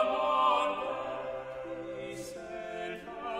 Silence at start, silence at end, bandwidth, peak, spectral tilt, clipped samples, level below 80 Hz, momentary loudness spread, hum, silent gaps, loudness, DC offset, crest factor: 0 s; 0 s; 15 kHz; -16 dBFS; -4 dB/octave; under 0.1%; -64 dBFS; 14 LU; none; none; -33 LUFS; under 0.1%; 18 dB